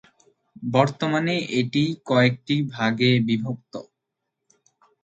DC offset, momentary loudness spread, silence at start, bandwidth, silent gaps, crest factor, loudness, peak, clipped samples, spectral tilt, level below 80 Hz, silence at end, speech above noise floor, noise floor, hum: under 0.1%; 14 LU; 0.6 s; 8 kHz; none; 22 dB; -22 LUFS; -2 dBFS; under 0.1%; -6.5 dB/octave; -64 dBFS; 1.2 s; 59 dB; -81 dBFS; none